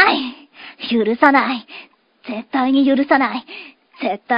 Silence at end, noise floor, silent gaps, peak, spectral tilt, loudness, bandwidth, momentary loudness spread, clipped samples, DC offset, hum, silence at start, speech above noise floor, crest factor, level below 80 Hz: 0 s; -43 dBFS; none; 0 dBFS; -6.5 dB/octave; -17 LUFS; 5.4 kHz; 24 LU; under 0.1%; under 0.1%; none; 0 s; 27 dB; 18 dB; -64 dBFS